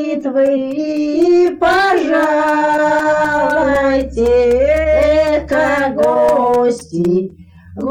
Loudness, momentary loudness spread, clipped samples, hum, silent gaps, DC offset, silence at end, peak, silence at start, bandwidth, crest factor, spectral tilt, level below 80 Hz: -13 LUFS; 6 LU; under 0.1%; none; none; under 0.1%; 0 s; -4 dBFS; 0 s; 15.5 kHz; 10 dB; -6 dB/octave; -34 dBFS